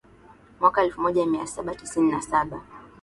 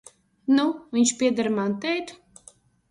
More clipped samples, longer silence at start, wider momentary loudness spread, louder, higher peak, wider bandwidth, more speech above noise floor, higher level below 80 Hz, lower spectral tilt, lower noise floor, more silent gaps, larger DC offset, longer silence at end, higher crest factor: neither; about the same, 0.6 s vs 0.5 s; first, 12 LU vs 9 LU; about the same, -24 LUFS vs -24 LUFS; first, -4 dBFS vs -10 dBFS; about the same, 11.5 kHz vs 11.5 kHz; second, 28 dB vs 32 dB; first, -54 dBFS vs -68 dBFS; first, -5 dB/octave vs -3.5 dB/octave; about the same, -52 dBFS vs -55 dBFS; neither; neither; second, 0.15 s vs 0.75 s; about the same, 20 dB vs 16 dB